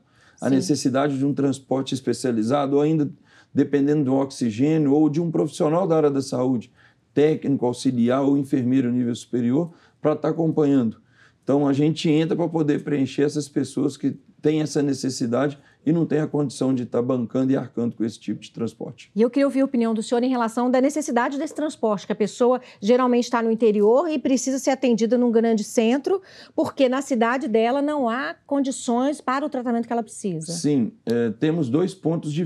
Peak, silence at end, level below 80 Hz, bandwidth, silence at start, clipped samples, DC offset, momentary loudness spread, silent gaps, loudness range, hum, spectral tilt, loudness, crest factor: -4 dBFS; 0 s; -76 dBFS; 12.5 kHz; 0.4 s; under 0.1%; under 0.1%; 7 LU; none; 3 LU; none; -6 dB/octave; -22 LUFS; 16 dB